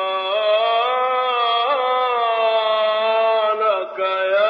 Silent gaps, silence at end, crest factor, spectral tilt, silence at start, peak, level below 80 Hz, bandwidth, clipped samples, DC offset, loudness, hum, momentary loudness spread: none; 0 s; 12 dB; -2.5 dB/octave; 0 s; -6 dBFS; -78 dBFS; 5.4 kHz; under 0.1%; under 0.1%; -18 LUFS; none; 3 LU